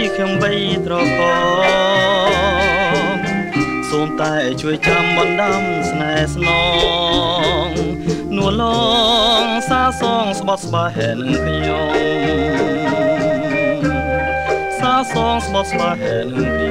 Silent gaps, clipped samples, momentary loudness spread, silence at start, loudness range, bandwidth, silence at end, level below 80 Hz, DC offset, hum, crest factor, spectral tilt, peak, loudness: none; under 0.1%; 6 LU; 0 s; 2 LU; 16 kHz; 0 s; -34 dBFS; under 0.1%; none; 14 dB; -5 dB/octave; -2 dBFS; -16 LUFS